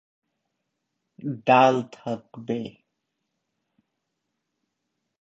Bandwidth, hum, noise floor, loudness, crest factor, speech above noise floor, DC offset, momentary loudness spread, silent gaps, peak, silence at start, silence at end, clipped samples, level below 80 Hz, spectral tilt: 7.8 kHz; none; -80 dBFS; -23 LUFS; 24 dB; 57 dB; under 0.1%; 17 LU; none; -4 dBFS; 1.2 s; 2.5 s; under 0.1%; -74 dBFS; -6 dB/octave